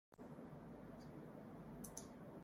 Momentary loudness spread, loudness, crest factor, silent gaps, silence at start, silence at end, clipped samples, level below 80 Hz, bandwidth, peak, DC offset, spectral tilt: 4 LU; -56 LUFS; 24 dB; none; 0.1 s; 0 s; under 0.1%; -72 dBFS; 16 kHz; -32 dBFS; under 0.1%; -5.5 dB/octave